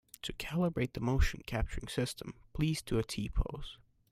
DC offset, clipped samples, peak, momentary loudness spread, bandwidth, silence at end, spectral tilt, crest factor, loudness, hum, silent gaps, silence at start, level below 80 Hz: under 0.1%; under 0.1%; -16 dBFS; 11 LU; 16 kHz; 0.35 s; -5.5 dB/octave; 18 dB; -36 LUFS; none; none; 0.25 s; -40 dBFS